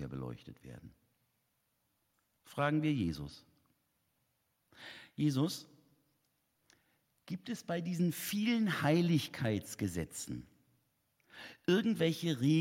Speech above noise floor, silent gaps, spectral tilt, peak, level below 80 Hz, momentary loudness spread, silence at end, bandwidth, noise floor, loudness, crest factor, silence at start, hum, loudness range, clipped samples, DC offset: 46 dB; none; -6 dB/octave; -18 dBFS; -68 dBFS; 20 LU; 0 s; 16.5 kHz; -80 dBFS; -35 LUFS; 20 dB; 0 s; none; 7 LU; under 0.1%; under 0.1%